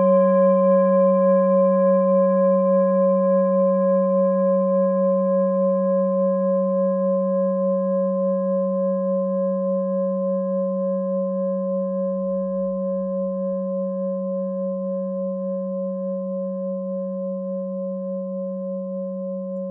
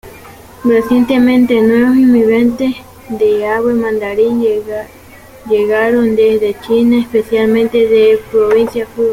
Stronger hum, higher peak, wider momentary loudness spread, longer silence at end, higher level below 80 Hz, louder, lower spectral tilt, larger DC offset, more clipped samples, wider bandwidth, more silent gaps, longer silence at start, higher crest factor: neither; second, -8 dBFS vs -2 dBFS; about the same, 11 LU vs 9 LU; about the same, 0 s vs 0 s; second, -70 dBFS vs -44 dBFS; second, -21 LUFS vs -12 LUFS; about the same, -7.5 dB/octave vs -6.5 dB/octave; neither; neither; second, 2.5 kHz vs 16 kHz; neither; about the same, 0 s vs 0.05 s; about the same, 12 dB vs 10 dB